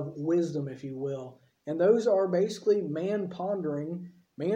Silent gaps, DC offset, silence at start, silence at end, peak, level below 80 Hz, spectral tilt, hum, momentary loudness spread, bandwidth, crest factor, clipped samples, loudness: none; under 0.1%; 0 s; 0 s; -12 dBFS; -76 dBFS; -7.5 dB/octave; none; 15 LU; 10 kHz; 16 dB; under 0.1%; -29 LUFS